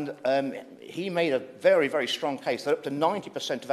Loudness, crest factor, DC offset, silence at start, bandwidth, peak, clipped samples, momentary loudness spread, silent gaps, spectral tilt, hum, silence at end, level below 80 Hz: -27 LUFS; 18 dB; under 0.1%; 0 s; 13.5 kHz; -10 dBFS; under 0.1%; 11 LU; none; -4.5 dB/octave; none; 0 s; -76 dBFS